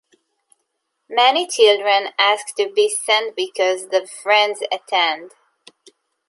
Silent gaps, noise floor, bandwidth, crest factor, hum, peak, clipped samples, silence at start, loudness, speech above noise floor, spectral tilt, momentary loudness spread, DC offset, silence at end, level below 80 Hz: none; -73 dBFS; 11.5 kHz; 18 dB; none; -2 dBFS; under 0.1%; 1.1 s; -17 LUFS; 56 dB; 0.5 dB/octave; 8 LU; under 0.1%; 1 s; -76 dBFS